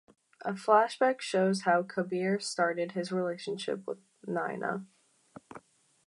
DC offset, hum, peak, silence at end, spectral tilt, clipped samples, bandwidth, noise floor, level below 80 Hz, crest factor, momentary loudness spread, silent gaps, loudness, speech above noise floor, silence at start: under 0.1%; none; -10 dBFS; 0.5 s; -5 dB/octave; under 0.1%; 11.5 kHz; -56 dBFS; -84 dBFS; 22 dB; 15 LU; none; -31 LUFS; 26 dB; 0.4 s